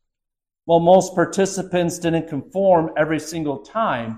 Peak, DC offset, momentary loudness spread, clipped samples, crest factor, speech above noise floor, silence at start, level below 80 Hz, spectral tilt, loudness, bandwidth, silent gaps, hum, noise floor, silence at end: -2 dBFS; under 0.1%; 11 LU; under 0.1%; 16 dB; 65 dB; 0.65 s; -54 dBFS; -5.5 dB/octave; -19 LUFS; 15 kHz; none; none; -83 dBFS; 0 s